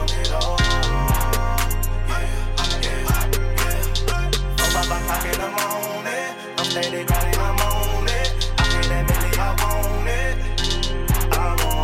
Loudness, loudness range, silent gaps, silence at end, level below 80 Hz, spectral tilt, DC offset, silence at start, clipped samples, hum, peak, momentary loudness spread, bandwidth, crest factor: -22 LUFS; 1 LU; none; 0 s; -22 dBFS; -3.5 dB/octave; under 0.1%; 0 s; under 0.1%; none; -6 dBFS; 5 LU; 16 kHz; 14 dB